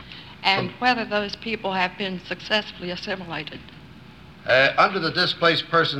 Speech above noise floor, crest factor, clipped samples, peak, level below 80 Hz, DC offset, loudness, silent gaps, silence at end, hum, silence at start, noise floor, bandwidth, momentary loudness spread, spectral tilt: 22 dB; 22 dB; under 0.1%; -2 dBFS; -56 dBFS; 0.1%; -22 LUFS; none; 0 s; none; 0 s; -45 dBFS; 14 kHz; 14 LU; -5 dB/octave